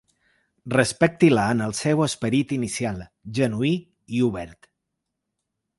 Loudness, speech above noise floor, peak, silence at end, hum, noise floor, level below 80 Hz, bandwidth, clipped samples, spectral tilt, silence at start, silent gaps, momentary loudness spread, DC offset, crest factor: -23 LUFS; 59 dB; -4 dBFS; 1.25 s; none; -81 dBFS; -54 dBFS; 11.5 kHz; under 0.1%; -5.5 dB/octave; 0.65 s; none; 12 LU; under 0.1%; 20 dB